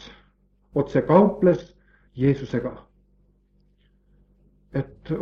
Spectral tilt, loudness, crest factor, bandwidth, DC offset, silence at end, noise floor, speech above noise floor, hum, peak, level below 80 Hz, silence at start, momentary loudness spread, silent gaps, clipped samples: -9.5 dB/octave; -23 LUFS; 22 dB; 6.8 kHz; under 0.1%; 0 s; -62 dBFS; 41 dB; none; -2 dBFS; -52 dBFS; 0.05 s; 14 LU; none; under 0.1%